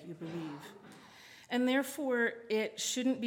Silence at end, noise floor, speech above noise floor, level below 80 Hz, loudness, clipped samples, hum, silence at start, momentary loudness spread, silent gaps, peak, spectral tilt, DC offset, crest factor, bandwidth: 0 s; -56 dBFS; 23 dB; -84 dBFS; -34 LUFS; under 0.1%; none; 0 s; 22 LU; none; -20 dBFS; -3 dB/octave; under 0.1%; 16 dB; 17.5 kHz